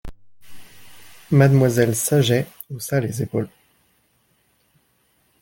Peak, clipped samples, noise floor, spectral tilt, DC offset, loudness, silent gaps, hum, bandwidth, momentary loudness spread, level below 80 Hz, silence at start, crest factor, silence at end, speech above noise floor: -2 dBFS; under 0.1%; -64 dBFS; -6 dB/octave; under 0.1%; -19 LUFS; none; none; 17 kHz; 15 LU; -50 dBFS; 0.05 s; 20 dB; 1.95 s; 46 dB